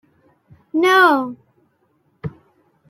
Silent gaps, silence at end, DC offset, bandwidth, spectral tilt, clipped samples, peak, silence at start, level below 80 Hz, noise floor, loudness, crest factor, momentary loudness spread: none; 0.6 s; under 0.1%; 15.5 kHz; -4.5 dB/octave; under 0.1%; -2 dBFS; 0.75 s; -60 dBFS; -63 dBFS; -15 LUFS; 18 dB; 21 LU